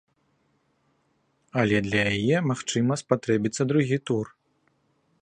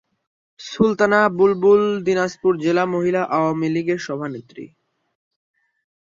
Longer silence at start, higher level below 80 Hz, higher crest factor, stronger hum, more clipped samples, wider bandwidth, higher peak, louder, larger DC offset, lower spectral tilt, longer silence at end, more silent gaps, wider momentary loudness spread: first, 1.55 s vs 0.6 s; about the same, -58 dBFS vs -60 dBFS; about the same, 22 dB vs 18 dB; neither; neither; first, 11 kHz vs 7.6 kHz; second, -6 dBFS vs -2 dBFS; second, -25 LUFS vs -18 LUFS; neither; about the same, -5.5 dB/octave vs -6.5 dB/octave; second, 0.95 s vs 1.45 s; neither; second, 6 LU vs 18 LU